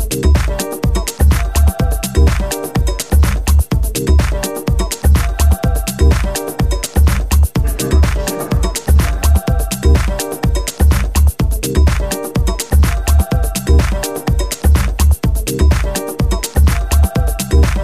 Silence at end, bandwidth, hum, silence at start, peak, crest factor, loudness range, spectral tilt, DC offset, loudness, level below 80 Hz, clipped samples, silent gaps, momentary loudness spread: 0 s; 15.5 kHz; none; 0 s; 0 dBFS; 12 dB; 1 LU; -5.5 dB/octave; 0.8%; -15 LUFS; -14 dBFS; under 0.1%; none; 5 LU